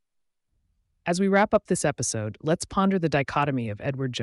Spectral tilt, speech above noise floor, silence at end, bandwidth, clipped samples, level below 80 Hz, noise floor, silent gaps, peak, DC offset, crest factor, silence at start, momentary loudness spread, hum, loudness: -5 dB/octave; 52 dB; 0 s; 11.5 kHz; under 0.1%; -54 dBFS; -76 dBFS; none; -10 dBFS; under 0.1%; 16 dB; 1.05 s; 8 LU; none; -25 LUFS